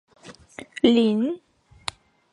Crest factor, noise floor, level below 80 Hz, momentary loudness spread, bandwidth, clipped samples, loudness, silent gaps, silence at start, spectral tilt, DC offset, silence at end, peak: 20 dB; -43 dBFS; -60 dBFS; 22 LU; 11.5 kHz; under 0.1%; -21 LUFS; none; 0.25 s; -5.5 dB/octave; under 0.1%; 0.95 s; -4 dBFS